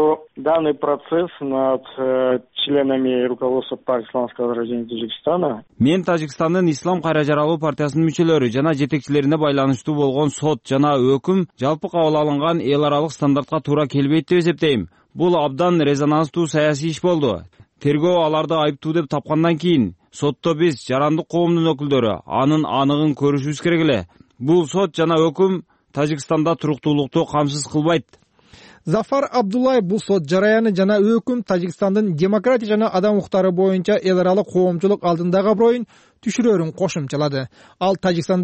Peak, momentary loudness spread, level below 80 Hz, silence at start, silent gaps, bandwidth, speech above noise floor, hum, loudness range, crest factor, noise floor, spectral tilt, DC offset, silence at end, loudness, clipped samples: -6 dBFS; 6 LU; -56 dBFS; 0 s; none; 8.8 kHz; 30 dB; none; 3 LU; 12 dB; -48 dBFS; -6.5 dB/octave; under 0.1%; 0 s; -19 LUFS; under 0.1%